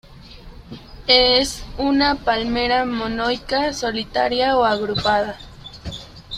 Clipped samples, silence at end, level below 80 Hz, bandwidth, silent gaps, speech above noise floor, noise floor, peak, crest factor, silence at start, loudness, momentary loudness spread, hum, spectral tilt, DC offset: under 0.1%; 0 s; -40 dBFS; 14.5 kHz; none; 21 dB; -40 dBFS; -2 dBFS; 20 dB; 0.05 s; -19 LUFS; 20 LU; none; -3.5 dB/octave; under 0.1%